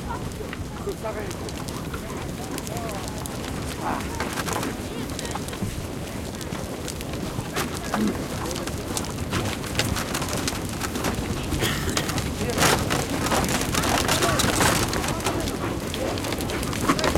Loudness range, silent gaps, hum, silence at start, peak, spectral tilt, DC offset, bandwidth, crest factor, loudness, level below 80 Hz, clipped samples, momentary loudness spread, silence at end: 8 LU; none; none; 0 s; -4 dBFS; -4 dB/octave; under 0.1%; 17 kHz; 22 dB; -26 LUFS; -38 dBFS; under 0.1%; 11 LU; 0 s